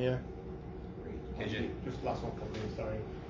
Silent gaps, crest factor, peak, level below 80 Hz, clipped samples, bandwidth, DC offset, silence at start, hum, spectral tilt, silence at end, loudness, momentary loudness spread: none; 18 dB; -20 dBFS; -48 dBFS; under 0.1%; 7.6 kHz; under 0.1%; 0 s; none; -7.5 dB/octave; 0 s; -40 LUFS; 8 LU